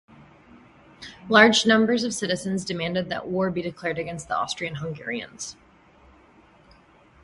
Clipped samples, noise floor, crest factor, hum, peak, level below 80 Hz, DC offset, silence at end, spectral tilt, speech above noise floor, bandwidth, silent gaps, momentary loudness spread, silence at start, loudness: under 0.1%; -55 dBFS; 24 dB; none; 0 dBFS; -58 dBFS; under 0.1%; 1.7 s; -4 dB/octave; 31 dB; 11.5 kHz; none; 20 LU; 0.55 s; -23 LUFS